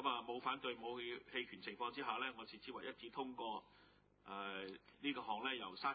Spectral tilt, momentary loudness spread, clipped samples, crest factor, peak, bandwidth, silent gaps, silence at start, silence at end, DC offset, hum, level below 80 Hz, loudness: -0.5 dB/octave; 9 LU; under 0.1%; 20 dB; -26 dBFS; 4.8 kHz; none; 0 s; 0 s; under 0.1%; 50 Hz at -80 dBFS; -80 dBFS; -46 LUFS